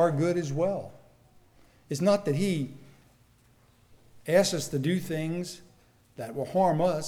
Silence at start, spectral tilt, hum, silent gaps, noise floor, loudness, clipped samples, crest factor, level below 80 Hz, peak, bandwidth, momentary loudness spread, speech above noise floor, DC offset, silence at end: 0 s; -5.5 dB/octave; none; none; -61 dBFS; -28 LUFS; under 0.1%; 18 dB; -62 dBFS; -10 dBFS; 18 kHz; 15 LU; 34 dB; under 0.1%; 0 s